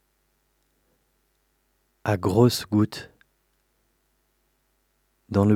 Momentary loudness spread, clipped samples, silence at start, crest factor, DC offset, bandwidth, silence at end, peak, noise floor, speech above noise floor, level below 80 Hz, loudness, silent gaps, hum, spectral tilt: 16 LU; under 0.1%; 2.05 s; 22 dB; under 0.1%; 16.5 kHz; 0 s; -4 dBFS; -70 dBFS; 49 dB; -62 dBFS; -23 LUFS; none; 50 Hz at -50 dBFS; -6.5 dB/octave